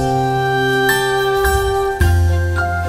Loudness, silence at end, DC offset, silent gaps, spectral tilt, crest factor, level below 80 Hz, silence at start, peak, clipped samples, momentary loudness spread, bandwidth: -16 LUFS; 0 s; under 0.1%; none; -5 dB/octave; 12 dB; -24 dBFS; 0 s; -4 dBFS; under 0.1%; 3 LU; 16 kHz